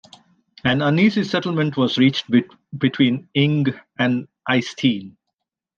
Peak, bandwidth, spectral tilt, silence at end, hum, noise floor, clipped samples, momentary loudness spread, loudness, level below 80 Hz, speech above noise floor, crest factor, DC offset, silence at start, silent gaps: -4 dBFS; 7.2 kHz; -6.5 dB/octave; 0.65 s; none; -80 dBFS; under 0.1%; 7 LU; -20 LUFS; -60 dBFS; 61 dB; 16 dB; under 0.1%; 0.65 s; none